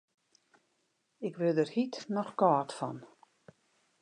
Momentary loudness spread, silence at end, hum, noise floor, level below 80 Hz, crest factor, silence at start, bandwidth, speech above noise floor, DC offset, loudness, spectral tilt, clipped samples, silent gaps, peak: 13 LU; 0.95 s; none; -77 dBFS; -86 dBFS; 22 dB; 1.2 s; 11 kHz; 46 dB; under 0.1%; -32 LUFS; -6.5 dB/octave; under 0.1%; none; -12 dBFS